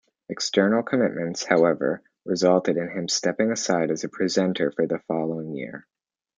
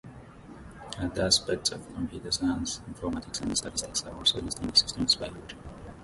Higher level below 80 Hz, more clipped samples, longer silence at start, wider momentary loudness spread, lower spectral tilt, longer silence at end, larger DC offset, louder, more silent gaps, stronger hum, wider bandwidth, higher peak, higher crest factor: second, -70 dBFS vs -48 dBFS; neither; first, 0.3 s vs 0.05 s; second, 11 LU vs 22 LU; first, -4.5 dB/octave vs -2.5 dB/octave; first, 0.6 s vs 0 s; neither; first, -24 LUFS vs -28 LUFS; neither; neither; second, 9.6 kHz vs 12 kHz; first, -4 dBFS vs -8 dBFS; about the same, 20 dB vs 22 dB